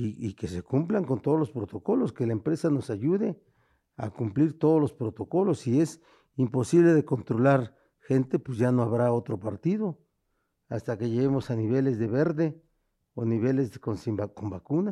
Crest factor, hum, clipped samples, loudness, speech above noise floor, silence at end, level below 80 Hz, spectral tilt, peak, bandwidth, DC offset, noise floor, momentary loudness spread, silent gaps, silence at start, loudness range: 18 dB; none; under 0.1%; -27 LUFS; 50 dB; 0 s; -62 dBFS; -8.5 dB/octave; -10 dBFS; 12 kHz; under 0.1%; -76 dBFS; 11 LU; none; 0 s; 4 LU